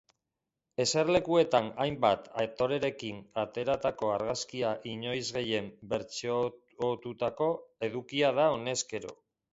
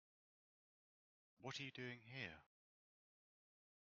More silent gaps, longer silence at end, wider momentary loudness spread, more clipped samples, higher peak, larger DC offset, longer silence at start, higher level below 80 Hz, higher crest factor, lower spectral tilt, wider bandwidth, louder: neither; second, 0.4 s vs 1.35 s; first, 10 LU vs 7 LU; neither; first, -10 dBFS vs -36 dBFS; neither; second, 0.8 s vs 1.4 s; first, -64 dBFS vs -88 dBFS; about the same, 22 dB vs 22 dB; about the same, -4 dB/octave vs -3 dB/octave; first, 8 kHz vs 6.8 kHz; first, -31 LUFS vs -53 LUFS